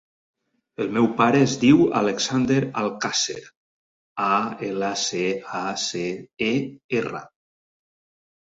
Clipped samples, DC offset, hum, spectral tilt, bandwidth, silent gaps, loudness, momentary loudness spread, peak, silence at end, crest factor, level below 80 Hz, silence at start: under 0.1%; under 0.1%; none; -4.5 dB/octave; 8 kHz; 3.57-4.16 s, 6.84-6.89 s; -22 LUFS; 12 LU; -4 dBFS; 1.2 s; 20 dB; -62 dBFS; 0.8 s